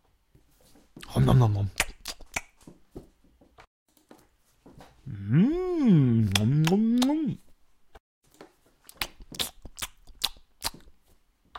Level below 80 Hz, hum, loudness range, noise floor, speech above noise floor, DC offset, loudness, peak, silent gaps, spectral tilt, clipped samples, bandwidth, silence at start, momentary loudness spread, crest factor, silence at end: -48 dBFS; none; 12 LU; -63 dBFS; 41 dB; under 0.1%; -26 LUFS; 0 dBFS; 3.67-3.86 s, 8.00-8.21 s; -6 dB/octave; under 0.1%; 16.5 kHz; 0.95 s; 17 LU; 28 dB; 0 s